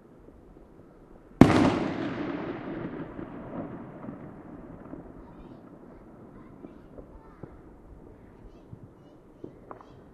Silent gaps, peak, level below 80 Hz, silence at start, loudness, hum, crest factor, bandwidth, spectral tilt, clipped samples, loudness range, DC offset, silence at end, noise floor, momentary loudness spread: none; 0 dBFS; -50 dBFS; 0.3 s; -27 LUFS; none; 32 dB; 12 kHz; -7.5 dB/octave; under 0.1%; 22 LU; under 0.1%; 0.1 s; -53 dBFS; 27 LU